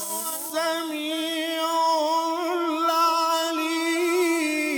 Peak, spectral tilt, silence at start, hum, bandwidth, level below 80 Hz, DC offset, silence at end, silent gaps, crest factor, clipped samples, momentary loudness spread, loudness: -10 dBFS; -0.5 dB/octave; 0 s; none; over 20 kHz; -82 dBFS; under 0.1%; 0 s; none; 14 dB; under 0.1%; 6 LU; -24 LUFS